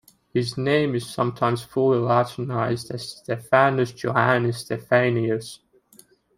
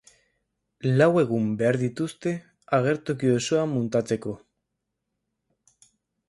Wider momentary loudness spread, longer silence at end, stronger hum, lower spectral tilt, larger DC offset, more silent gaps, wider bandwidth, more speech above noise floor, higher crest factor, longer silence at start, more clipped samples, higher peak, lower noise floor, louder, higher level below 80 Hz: about the same, 11 LU vs 11 LU; second, 0.8 s vs 1.9 s; neither; about the same, -6 dB/octave vs -6.5 dB/octave; neither; neither; first, 16 kHz vs 11.5 kHz; second, 33 dB vs 58 dB; about the same, 20 dB vs 18 dB; second, 0.35 s vs 0.85 s; neither; first, -2 dBFS vs -8 dBFS; second, -55 dBFS vs -81 dBFS; about the same, -23 LUFS vs -24 LUFS; about the same, -60 dBFS vs -64 dBFS